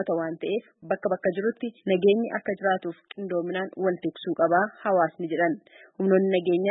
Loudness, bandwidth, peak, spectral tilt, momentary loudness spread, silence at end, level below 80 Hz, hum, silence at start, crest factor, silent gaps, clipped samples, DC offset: -26 LUFS; 4 kHz; -10 dBFS; -11 dB/octave; 9 LU; 0 s; -76 dBFS; none; 0 s; 16 dB; none; under 0.1%; under 0.1%